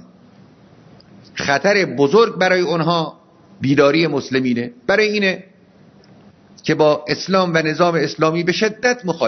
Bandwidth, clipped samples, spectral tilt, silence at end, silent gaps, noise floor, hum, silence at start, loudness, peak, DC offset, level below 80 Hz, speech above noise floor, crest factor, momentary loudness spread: 6.4 kHz; under 0.1%; -5 dB/octave; 0 s; none; -48 dBFS; none; 1.35 s; -17 LUFS; 0 dBFS; under 0.1%; -58 dBFS; 32 dB; 18 dB; 8 LU